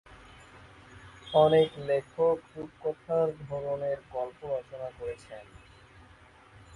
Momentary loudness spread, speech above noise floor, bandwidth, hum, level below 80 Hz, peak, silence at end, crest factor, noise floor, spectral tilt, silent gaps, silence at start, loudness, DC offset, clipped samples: 22 LU; 27 dB; 11 kHz; none; -60 dBFS; -10 dBFS; 0 s; 22 dB; -56 dBFS; -7 dB/octave; none; 0.1 s; -29 LUFS; under 0.1%; under 0.1%